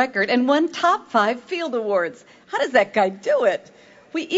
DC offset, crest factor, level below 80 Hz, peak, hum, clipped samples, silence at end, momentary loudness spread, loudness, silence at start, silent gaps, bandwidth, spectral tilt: under 0.1%; 18 dB; -70 dBFS; -2 dBFS; none; under 0.1%; 0 s; 11 LU; -21 LUFS; 0 s; none; 8 kHz; -4.5 dB/octave